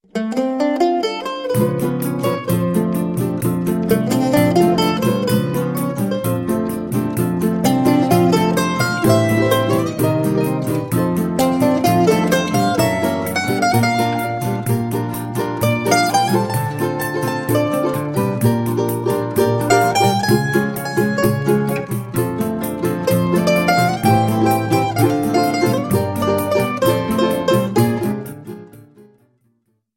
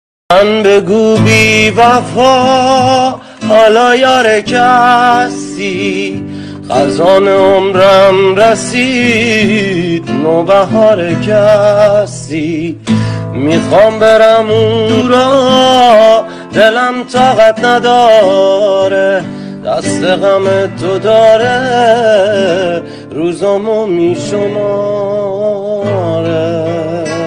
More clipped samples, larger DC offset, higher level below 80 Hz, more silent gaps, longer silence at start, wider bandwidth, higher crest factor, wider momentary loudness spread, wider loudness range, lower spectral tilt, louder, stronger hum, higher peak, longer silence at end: neither; neither; second, -48 dBFS vs -42 dBFS; neither; second, 0.15 s vs 0.3 s; first, 17 kHz vs 13 kHz; first, 16 dB vs 8 dB; second, 6 LU vs 9 LU; about the same, 3 LU vs 4 LU; about the same, -6 dB/octave vs -5 dB/octave; second, -17 LUFS vs -9 LUFS; neither; about the same, 0 dBFS vs 0 dBFS; first, 1.15 s vs 0 s